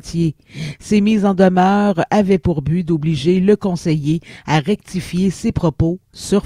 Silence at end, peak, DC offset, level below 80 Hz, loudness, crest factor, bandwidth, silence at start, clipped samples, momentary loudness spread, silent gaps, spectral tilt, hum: 0.05 s; 0 dBFS; under 0.1%; -38 dBFS; -16 LUFS; 16 dB; 12 kHz; 0.05 s; under 0.1%; 9 LU; none; -7 dB/octave; none